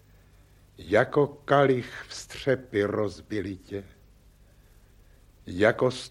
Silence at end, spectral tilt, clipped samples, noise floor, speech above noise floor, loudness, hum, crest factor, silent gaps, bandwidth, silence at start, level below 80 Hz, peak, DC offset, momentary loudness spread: 0 s; -6 dB/octave; under 0.1%; -56 dBFS; 30 dB; -26 LUFS; 50 Hz at -55 dBFS; 22 dB; none; 12.5 kHz; 0.8 s; -56 dBFS; -8 dBFS; under 0.1%; 16 LU